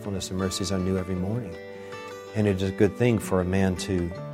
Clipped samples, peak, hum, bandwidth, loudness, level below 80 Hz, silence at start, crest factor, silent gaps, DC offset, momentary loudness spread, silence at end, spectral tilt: under 0.1%; -8 dBFS; none; 16 kHz; -26 LUFS; -50 dBFS; 0 s; 18 dB; none; under 0.1%; 15 LU; 0 s; -6 dB/octave